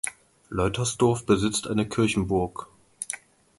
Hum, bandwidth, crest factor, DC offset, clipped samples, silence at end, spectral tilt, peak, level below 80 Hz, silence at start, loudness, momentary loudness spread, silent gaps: none; 12 kHz; 18 dB; under 0.1%; under 0.1%; 0.4 s; -5 dB/octave; -8 dBFS; -46 dBFS; 0.05 s; -26 LUFS; 11 LU; none